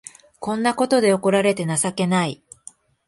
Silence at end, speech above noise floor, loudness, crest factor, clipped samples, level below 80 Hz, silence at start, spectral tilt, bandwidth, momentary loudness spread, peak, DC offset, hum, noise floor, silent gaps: 0.75 s; 28 dB; -20 LUFS; 16 dB; under 0.1%; -62 dBFS; 0.4 s; -4.5 dB/octave; 11.5 kHz; 10 LU; -6 dBFS; under 0.1%; none; -47 dBFS; none